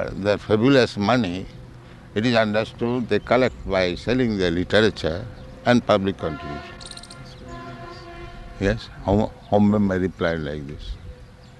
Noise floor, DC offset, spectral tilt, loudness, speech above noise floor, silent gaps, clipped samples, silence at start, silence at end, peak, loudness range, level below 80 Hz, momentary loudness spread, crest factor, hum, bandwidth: -42 dBFS; under 0.1%; -6.5 dB/octave; -22 LUFS; 21 dB; none; under 0.1%; 0 s; 0.1 s; -4 dBFS; 5 LU; -42 dBFS; 20 LU; 20 dB; none; 11 kHz